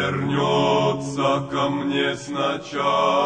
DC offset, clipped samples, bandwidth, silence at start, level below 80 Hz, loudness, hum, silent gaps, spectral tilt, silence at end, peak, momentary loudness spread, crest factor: under 0.1%; under 0.1%; 9.6 kHz; 0 s; -56 dBFS; -22 LUFS; none; none; -5.5 dB/octave; 0 s; -6 dBFS; 6 LU; 14 dB